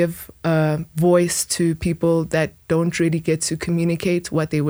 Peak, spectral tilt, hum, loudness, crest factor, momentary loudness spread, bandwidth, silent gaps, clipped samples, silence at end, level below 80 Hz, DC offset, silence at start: -4 dBFS; -5.5 dB/octave; none; -20 LUFS; 16 dB; 5 LU; over 20 kHz; none; under 0.1%; 0 s; -46 dBFS; under 0.1%; 0 s